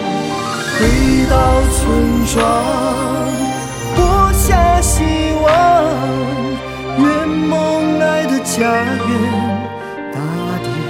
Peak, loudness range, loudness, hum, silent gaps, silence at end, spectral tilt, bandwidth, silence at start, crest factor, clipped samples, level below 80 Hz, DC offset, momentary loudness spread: 0 dBFS; 2 LU; -14 LUFS; none; none; 0 s; -5 dB/octave; 17.5 kHz; 0 s; 14 dB; under 0.1%; -22 dBFS; under 0.1%; 9 LU